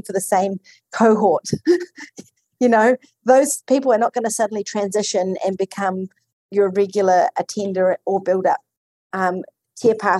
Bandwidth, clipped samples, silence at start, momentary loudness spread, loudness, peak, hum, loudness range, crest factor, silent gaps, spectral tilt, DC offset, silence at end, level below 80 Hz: 13.5 kHz; under 0.1%; 0.05 s; 14 LU; -19 LUFS; -2 dBFS; none; 3 LU; 16 dB; 6.33-6.49 s, 8.77-9.10 s; -4.5 dB/octave; under 0.1%; 0 s; -70 dBFS